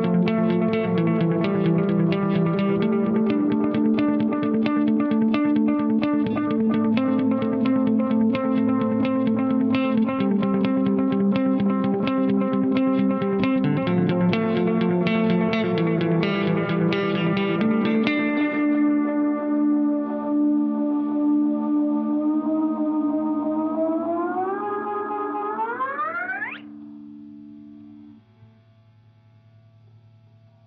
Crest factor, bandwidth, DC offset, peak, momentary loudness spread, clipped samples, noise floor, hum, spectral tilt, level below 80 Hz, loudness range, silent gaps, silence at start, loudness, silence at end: 18 dB; 5.6 kHz; under 0.1%; -4 dBFS; 5 LU; under 0.1%; -54 dBFS; none; -6.5 dB/octave; -60 dBFS; 5 LU; none; 0 s; -22 LUFS; 2.55 s